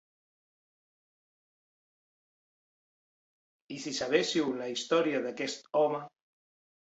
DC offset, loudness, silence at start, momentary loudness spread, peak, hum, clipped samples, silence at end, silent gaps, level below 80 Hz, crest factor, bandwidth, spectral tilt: under 0.1%; -31 LUFS; 3.7 s; 12 LU; -12 dBFS; none; under 0.1%; 0.75 s; none; -78 dBFS; 22 dB; 8.2 kHz; -3.5 dB/octave